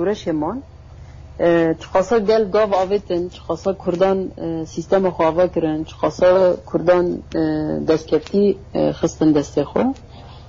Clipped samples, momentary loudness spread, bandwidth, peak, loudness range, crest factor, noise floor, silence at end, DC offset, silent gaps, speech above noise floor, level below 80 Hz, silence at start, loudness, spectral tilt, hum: under 0.1%; 8 LU; 7.6 kHz; -4 dBFS; 2 LU; 14 dB; -38 dBFS; 0 s; under 0.1%; none; 20 dB; -42 dBFS; 0 s; -19 LUFS; -6.5 dB/octave; none